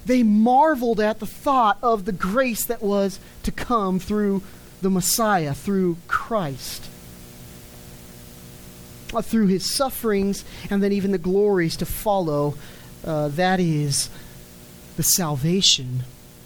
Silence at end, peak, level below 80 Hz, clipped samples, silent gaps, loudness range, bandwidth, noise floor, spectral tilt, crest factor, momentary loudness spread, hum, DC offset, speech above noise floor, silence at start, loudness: 0.1 s; -2 dBFS; -44 dBFS; under 0.1%; none; 7 LU; over 20 kHz; -43 dBFS; -4.5 dB/octave; 20 dB; 24 LU; none; under 0.1%; 22 dB; 0 s; -21 LUFS